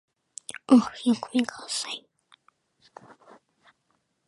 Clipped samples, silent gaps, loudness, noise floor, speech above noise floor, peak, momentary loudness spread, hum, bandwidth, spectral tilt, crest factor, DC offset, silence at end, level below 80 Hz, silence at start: under 0.1%; none; -25 LUFS; -73 dBFS; 50 dB; -6 dBFS; 20 LU; none; 11.5 kHz; -4 dB/octave; 22 dB; under 0.1%; 2.3 s; -72 dBFS; 0.7 s